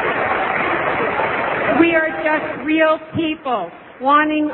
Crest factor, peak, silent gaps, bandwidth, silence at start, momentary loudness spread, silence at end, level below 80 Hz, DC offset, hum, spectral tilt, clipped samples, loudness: 18 dB; 0 dBFS; none; 4.2 kHz; 0 s; 8 LU; 0 s; -52 dBFS; under 0.1%; none; -9 dB/octave; under 0.1%; -17 LUFS